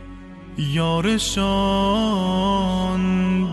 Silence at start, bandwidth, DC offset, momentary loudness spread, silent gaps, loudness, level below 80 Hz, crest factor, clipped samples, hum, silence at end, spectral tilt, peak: 0 s; 12 kHz; under 0.1%; 8 LU; none; -20 LUFS; -36 dBFS; 10 dB; under 0.1%; none; 0 s; -5.5 dB/octave; -10 dBFS